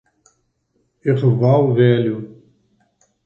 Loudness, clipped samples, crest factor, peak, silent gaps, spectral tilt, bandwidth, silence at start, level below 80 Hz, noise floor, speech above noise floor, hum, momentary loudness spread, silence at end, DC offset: -16 LUFS; under 0.1%; 16 dB; -2 dBFS; none; -10 dB/octave; 5.6 kHz; 1.05 s; -60 dBFS; -67 dBFS; 52 dB; none; 13 LU; 0.9 s; under 0.1%